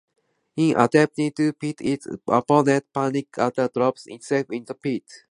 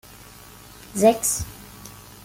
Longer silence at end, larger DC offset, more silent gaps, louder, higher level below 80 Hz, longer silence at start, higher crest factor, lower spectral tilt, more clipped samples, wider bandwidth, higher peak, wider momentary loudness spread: about the same, 0.15 s vs 0.25 s; neither; neither; about the same, -23 LUFS vs -21 LUFS; second, -66 dBFS vs -48 dBFS; second, 0.55 s vs 0.9 s; about the same, 22 dB vs 22 dB; first, -6.5 dB/octave vs -4 dB/octave; neither; second, 11 kHz vs 17 kHz; about the same, -2 dBFS vs -4 dBFS; second, 11 LU vs 25 LU